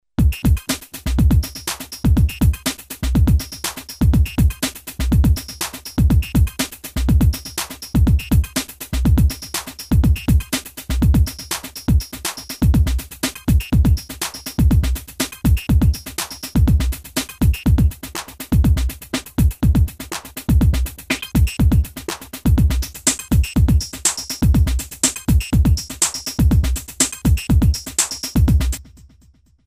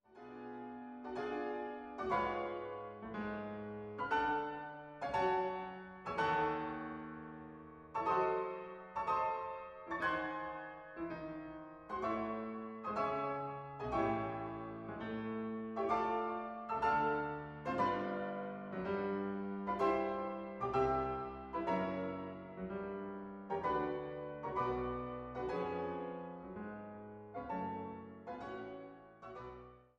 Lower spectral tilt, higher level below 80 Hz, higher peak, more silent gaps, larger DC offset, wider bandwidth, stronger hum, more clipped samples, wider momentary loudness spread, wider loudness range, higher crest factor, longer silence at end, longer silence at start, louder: second, -5 dB/octave vs -7.5 dB/octave; first, -20 dBFS vs -64 dBFS; first, 0 dBFS vs -22 dBFS; neither; neither; first, 16 kHz vs 9 kHz; neither; neither; second, 9 LU vs 14 LU; about the same, 2 LU vs 4 LU; about the same, 16 dB vs 18 dB; first, 0.85 s vs 0.15 s; about the same, 0.2 s vs 0.1 s; first, -19 LUFS vs -40 LUFS